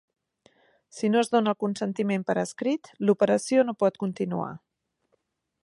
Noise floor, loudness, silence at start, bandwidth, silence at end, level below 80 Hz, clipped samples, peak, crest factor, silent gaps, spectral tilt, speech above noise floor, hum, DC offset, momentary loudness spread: -74 dBFS; -26 LUFS; 0.95 s; 11.5 kHz; 1.05 s; -74 dBFS; under 0.1%; -10 dBFS; 18 dB; none; -6 dB/octave; 48 dB; none; under 0.1%; 8 LU